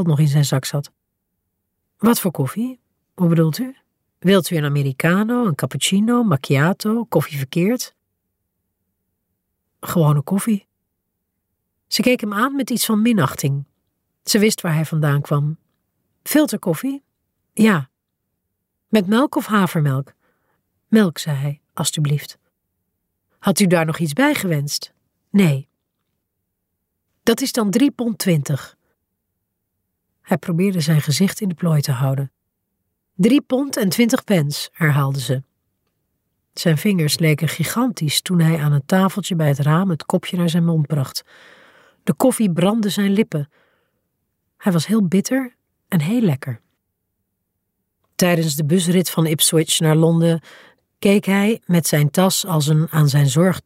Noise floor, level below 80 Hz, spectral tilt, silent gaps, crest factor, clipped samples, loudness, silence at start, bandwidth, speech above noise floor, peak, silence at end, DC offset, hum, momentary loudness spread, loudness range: -76 dBFS; -62 dBFS; -5.5 dB/octave; none; 16 dB; under 0.1%; -18 LUFS; 0 s; 16 kHz; 58 dB; -2 dBFS; 0.05 s; under 0.1%; none; 10 LU; 5 LU